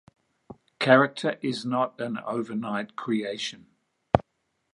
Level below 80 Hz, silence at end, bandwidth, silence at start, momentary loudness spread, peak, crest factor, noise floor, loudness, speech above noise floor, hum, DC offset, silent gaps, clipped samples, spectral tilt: -54 dBFS; 0.55 s; 11 kHz; 0.5 s; 12 LU; 0 dBFS; 28 dB; -76 dBFS; -26 LUFS; 50 dB; none; under 0.1%; none; under 0.1%; -5.5 dB/octave